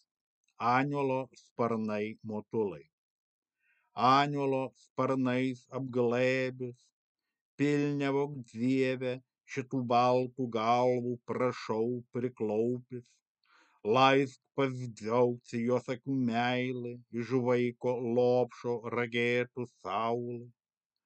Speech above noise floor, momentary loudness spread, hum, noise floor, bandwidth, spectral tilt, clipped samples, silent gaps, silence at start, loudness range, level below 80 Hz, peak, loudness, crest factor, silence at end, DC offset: 45 dB; 13 LU; none; -76 dBFS; 8.6 kHz; -6.5 dB/octave; under 0.1%; 1.51-1.56 s, 2.93-3.42 s, 4.90-4.96 s, 6.92-7.15 s, 7.41-7.58 s, 13.22-13.35 s; 0.6 s; 3 LU; -84 dBFS; -10 dBFS; -32 LUFS; 22 dB; 0.55 s; under 0.1%